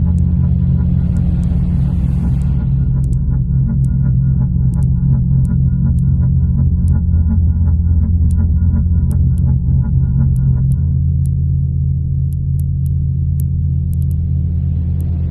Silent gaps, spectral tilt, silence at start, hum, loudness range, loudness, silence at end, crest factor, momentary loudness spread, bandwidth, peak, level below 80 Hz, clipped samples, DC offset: none; -11 dB/octave; 0 s; none; 3 LU; -15 LUFS; 0 s; 10 dB; 3 LU; 1.6 kHz; -2 dBFS; -18 dBFS; under 0.1%; under 0.1%